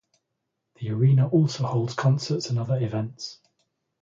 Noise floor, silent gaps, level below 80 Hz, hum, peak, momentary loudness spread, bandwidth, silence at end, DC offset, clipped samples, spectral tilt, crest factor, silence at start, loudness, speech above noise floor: -80 dBFS; none; -62 dBFS; none; -10 dBFS; 15 LU; 7.6 kHz; 0.7 s; under 0.1%; under 0.1%; -7 dB/octave; 16 dB; 0.8 s; -24 LUFS; 57 dB